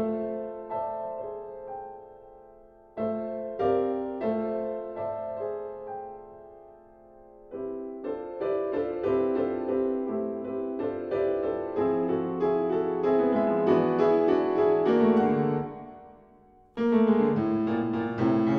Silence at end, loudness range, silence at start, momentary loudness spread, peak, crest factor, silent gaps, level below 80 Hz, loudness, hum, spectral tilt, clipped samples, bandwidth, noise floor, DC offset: 0 s; 12 LU; 0 s; 16 LU; -10 dBFS; 18 dB; none; -62 dBFS; -27 LUFS; none; -9.5 dB/octave; under 0.1%; 6 kHz; -57 dBFS; under 0.1%